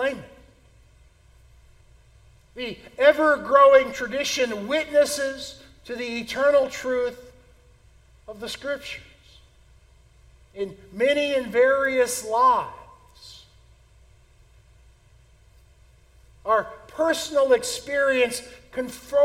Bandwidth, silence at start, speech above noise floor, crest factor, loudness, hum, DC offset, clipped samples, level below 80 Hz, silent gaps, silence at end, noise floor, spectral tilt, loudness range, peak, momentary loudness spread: 16 kHz; 0 s; 33 dB; 22 dB; -22 LUFS; none; under 0.1%; under 0.1%; -56 dBFS; none; 0 s; -55 dBFS; -2.5 dB/octave; 13 LU; -4 dBFS; 18 LU